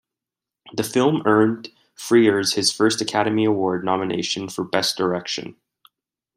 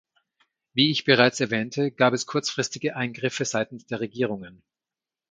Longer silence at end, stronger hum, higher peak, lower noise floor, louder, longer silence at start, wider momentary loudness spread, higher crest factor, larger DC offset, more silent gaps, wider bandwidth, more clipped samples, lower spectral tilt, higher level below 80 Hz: about the same, 0.85 s vs 0.8 s; neither; about the same, -4 dBFS vs -2 dBFS; about the same, -87 dBFS vs under -90 dBFS; first, -20 LUFS vs -24 LUFS; about the same, 0.65 s vs 0.75 s; about the same, 12 LU vs 11 LU; second, 18 dB vs 24 dB; neither; neither; first, 16 kHz vs 9.6 kHz; neither; about the same, -4 dB/octave vs -4 dB/octave; about the same, -66 dBFS vs -68 dBFS